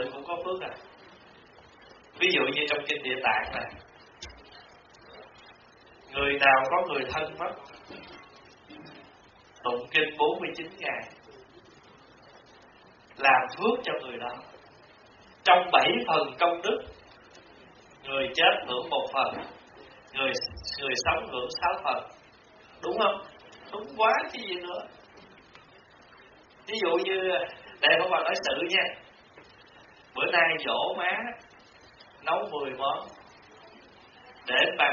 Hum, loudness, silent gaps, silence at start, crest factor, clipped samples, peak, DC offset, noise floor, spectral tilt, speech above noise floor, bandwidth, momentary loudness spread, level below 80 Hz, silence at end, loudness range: none; -27 LUFS; none; 0 s; 24 dB; under 0.1%; -6 dBFS; under 0.1%; -55 dBFS; 0 dB/octave; 28 dB; 7 kHz; 23 LU; -62 dBFS; 0 s; 6 LU